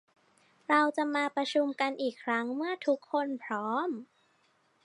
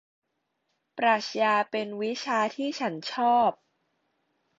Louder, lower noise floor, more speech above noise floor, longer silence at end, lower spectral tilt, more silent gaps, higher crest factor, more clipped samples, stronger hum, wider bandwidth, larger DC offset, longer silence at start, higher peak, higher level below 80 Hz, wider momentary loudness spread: second, -31 LUFS vs -27 LUFS; second, -70 dBFS vs -78 dBFS; second, 39 dB vs 52 dB; second, 0.8 s vs 1.05 s; about the same, -4 dB/octave vs -4 dB/octave; neither; about the same, 20 dB vs 18 dB; neither; neither; first, 11 kHz vs 7.8 kHz; neither; second, 0.7 s vs 0.95 s; about the same, -12 dBFS vs -12 dBFS; second, -88 dBFS vs -76 dBFS; about the same, 8 LU vs 8 LU